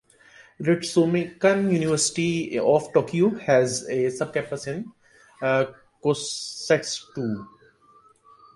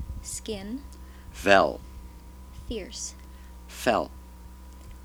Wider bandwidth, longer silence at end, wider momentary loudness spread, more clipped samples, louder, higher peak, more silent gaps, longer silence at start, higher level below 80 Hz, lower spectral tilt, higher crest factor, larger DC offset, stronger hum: second, 11.5 kHz vs over 20 kHz; first, 1.1 s vs 0 s; second, 10 LU vs 26 LU; neither; first, -24 LUFS vs -27 LUFS; second, -6 dBFS vs -2 dBFS; neither; first, 0.6 s vs 0 s; second, -64 dBFS vs -44 dBFS; about the same, -4.5 dB/octave vs -3.5 dB/octave; second, 18 dB vs 28 dB; neither; neither